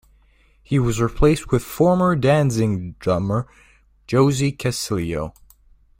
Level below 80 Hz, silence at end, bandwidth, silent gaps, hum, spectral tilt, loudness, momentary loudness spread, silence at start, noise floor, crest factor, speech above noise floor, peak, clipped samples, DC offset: -36 dBFS; 0.7 s; 16.5 kHz; none; none; -6.5 dB/octave; -20 LUFS; 9 LU; 0.7 s; -55 dBFS; 18 dB; 36 dB; -2 dBFS; under 0.1%; under 0.1%